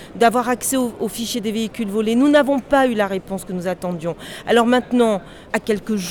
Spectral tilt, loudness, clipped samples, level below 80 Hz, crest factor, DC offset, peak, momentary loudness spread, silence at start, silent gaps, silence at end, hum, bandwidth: -4.5 dB/octave; -19 LUFS; under 0.1%; -48 dBFS; 14 dB; under 0.1%; -4 dBFS; 10 LU; 0 s; none; 0 s; none; 19.5 kHz